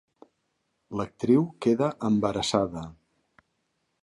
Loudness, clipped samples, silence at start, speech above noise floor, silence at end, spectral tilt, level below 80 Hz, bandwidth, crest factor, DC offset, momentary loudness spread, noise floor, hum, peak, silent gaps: -26 LUFS; under 0.1%; 0.9 s; 51 dB; 1.1 s; -6 dB/octave; -58 dBFS; 11.5 kHz; 20 dB; under 0.1%; 13 LU; -76 dBFS; none; -10 dBFS; none